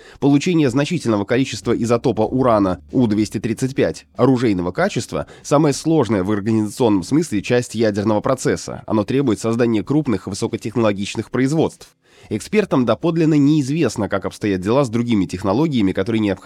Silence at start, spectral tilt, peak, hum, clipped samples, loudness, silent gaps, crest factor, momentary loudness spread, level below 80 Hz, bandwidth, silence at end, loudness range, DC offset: 0.05 s; -6.5 dB/octave; -2 dBFS; none; under 0.1%; -18 LUFS; none; 16 dB; 6 LU; -48 dBFS; 13.5 kHz; 0 s; 2 LU; under 0.1%